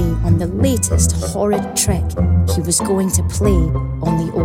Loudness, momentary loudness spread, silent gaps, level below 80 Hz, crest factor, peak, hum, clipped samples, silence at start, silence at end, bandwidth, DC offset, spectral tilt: -17 LUFS; 3 LU; none; -24 dBFS; 14 dB; 0 dBFS; none; under 0.1%; 0 s; 0 s; 16.5 kHz; under 0.1%; -5.5 dB/octave